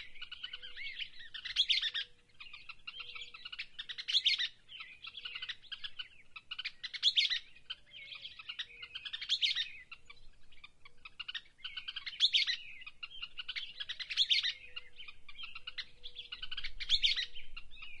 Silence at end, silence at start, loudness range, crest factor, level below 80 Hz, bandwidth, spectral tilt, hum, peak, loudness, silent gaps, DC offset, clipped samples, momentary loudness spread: 0 s; 0 s; 5 LU; 22 dB; -58 dBFS; 11.5 kHz; 2 dB/octave; none; -16 dBFS; -35 LUFS; none; under 0.1%; under 0.1%; 20 LU